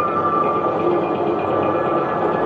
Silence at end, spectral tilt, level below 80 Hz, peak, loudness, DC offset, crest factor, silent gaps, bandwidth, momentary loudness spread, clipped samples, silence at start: 0 s; -8.5 dB/octave; -50 dBFS; -6 dBFS; -19 LUFS; under 0.1%; 12 dB; none; 6.6 kHz; 2 LU; under 0.1%; 0 s